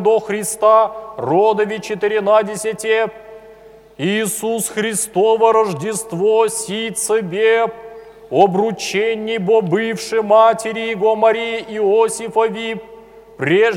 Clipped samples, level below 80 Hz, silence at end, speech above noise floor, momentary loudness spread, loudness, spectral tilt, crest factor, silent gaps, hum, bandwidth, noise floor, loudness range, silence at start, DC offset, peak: under 0.1%; -58 dBFS; 0 s; 26 dB; 9 LU; -16 LUFS; -4 dB/octave; 16 dB; none; none; 16.5 kHz; -42 dBFS; 3 LU; 0 s; under 0.1%; 0 dBFS